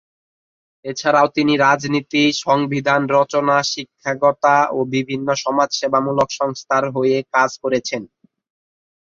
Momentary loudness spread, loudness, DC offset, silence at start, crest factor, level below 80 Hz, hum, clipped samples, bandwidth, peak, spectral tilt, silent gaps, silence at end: 8 LU; -17 LUFS; under 0.1%; 0.85 s; 16 dB; -60 dBFS; none; under 0.1%; 7.6 kHz; -2 dBFS; -4.5 dB/octave; none; 1.1 s